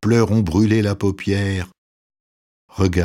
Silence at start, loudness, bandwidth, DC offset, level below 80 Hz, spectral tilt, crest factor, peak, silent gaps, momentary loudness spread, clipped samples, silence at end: 0 s; -19 LUFS; 13 kHz; under 0.1%; -40 dBFS; -7 dB/octave; 16 dB; -4 dBFS; 1.78-2.10 s, 2.20-2.69 s; 12 LU; under 0.1%; 0 s